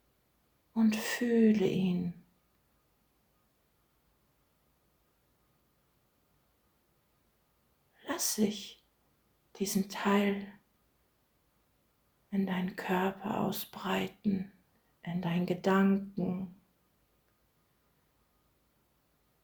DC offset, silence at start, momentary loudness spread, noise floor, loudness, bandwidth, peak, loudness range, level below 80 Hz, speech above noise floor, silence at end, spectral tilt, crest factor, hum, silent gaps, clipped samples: under 0.1%; 0.75 s; 13 LU; -73 dBFS; -32 LUFS; over 20 kHz; -16 dBFS; 7 LU; -72 dBFS; 42 dB; 2.9 s; -5.5 dB/octave; 20 dB; none; none; under 0.1%